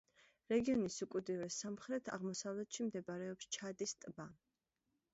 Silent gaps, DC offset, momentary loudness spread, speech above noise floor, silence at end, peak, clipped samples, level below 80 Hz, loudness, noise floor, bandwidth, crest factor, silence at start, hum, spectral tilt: none; under 0.1%; 9 LU; 46 dB; 0.8 s; -24 dBFS; under 0.1%; -76 dBFS; -43 LUFS; -88 dBFS; 8 kHz; 18 dB; 0.5 s; none; -5 dB/octave